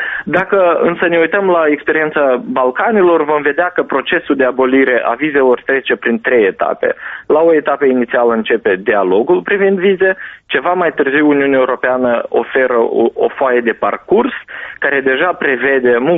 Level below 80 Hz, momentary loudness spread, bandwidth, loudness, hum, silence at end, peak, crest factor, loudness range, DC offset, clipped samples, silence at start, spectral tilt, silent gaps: -54 dBFS; 5 LU; 3.9 kHz; -13 LUFS; none; 0 s; 0 dBFS; 12 dB; 2 LU; under 0.1%; under 0.1%; 0 s; -3 dB/octave; none